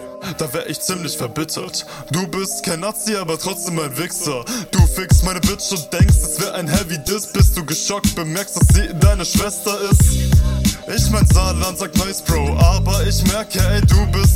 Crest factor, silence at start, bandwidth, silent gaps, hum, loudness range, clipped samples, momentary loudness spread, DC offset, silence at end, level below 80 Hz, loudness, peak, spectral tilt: 16 dB; 0 s; 16.5 kHz; none; none; 6 LU; under 0.1%; 9 LU; under 0.1%; 0 s; -20 dBFS; -17 LUFS; 0 dBFS; -4.5 dB/octave